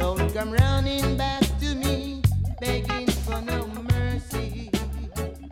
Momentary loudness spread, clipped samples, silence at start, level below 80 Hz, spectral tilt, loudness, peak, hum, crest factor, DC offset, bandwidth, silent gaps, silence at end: 9 LU; under 0.1%; 0 s; -30 dBFS; -5.5 dB/octave; -26 LUFS; -6 dBFS; none; 18 dB; under 0.1%; 16.5 kHz; none; 0 s